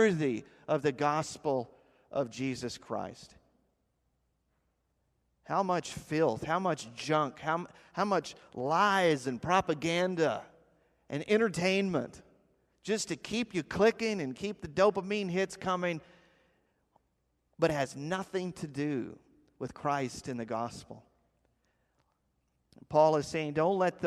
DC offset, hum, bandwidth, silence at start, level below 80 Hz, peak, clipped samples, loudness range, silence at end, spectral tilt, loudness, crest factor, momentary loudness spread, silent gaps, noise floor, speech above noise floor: under 0.1%; none; 13.5 kHz; 0 s; -66 dBFS; -12 dBFS; under 0.1%; 9 LU; 0 s; -5 dB/octave; -32 LUFS; 20 dB; 12 LU; none; -77 dBFS; 46 dB